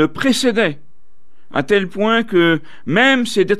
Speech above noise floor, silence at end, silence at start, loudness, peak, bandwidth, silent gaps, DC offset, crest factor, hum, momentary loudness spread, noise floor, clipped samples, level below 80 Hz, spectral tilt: 43 dB; 0 s; 0 s; -16 LUFS; -2 dBFS; 14.5 kHz; none; 3%; 14 dB; none; 8 LU; -59 dBFS; under 0.1%; -56 dBFS; -4.5 dB/octave